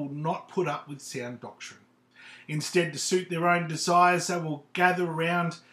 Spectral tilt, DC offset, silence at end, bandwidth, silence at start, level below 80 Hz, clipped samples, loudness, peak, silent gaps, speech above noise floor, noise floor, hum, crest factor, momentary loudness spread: -4.5 dB/octave; under 0.1%; 0.15 s; 15 kHz; 0 s; -82 dBFS; under 0.1%; -27 LUFS; -6 dBFS; none; 26 dB; -53 dBFS; none; 22 dB; 17 LU